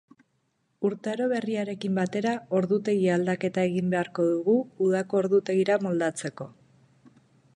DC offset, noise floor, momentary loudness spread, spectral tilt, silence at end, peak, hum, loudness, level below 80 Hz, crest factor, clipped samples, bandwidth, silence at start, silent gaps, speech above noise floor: under 0.1%; -73 dBFS; 6 LU; -6.5 dB/octave; 1.05 s; -12 dBFS; none; -26 LUFS; -72 dBFS; 16 dB; under 0.1%; 11.5 kHz; 0.8 s; none; 47 dB